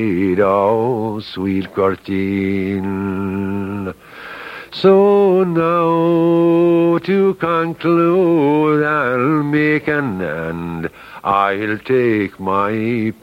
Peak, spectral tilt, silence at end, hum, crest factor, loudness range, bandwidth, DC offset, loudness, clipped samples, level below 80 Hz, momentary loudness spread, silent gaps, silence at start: 0 dBFS; -8.5 dB/octave; 0.1 s; none; 16 dB; 6 LU; 15 kHz; under 0.1%; -16 LUFS; under 0.1%; -52 dBFS; 11 LU; none; 0 s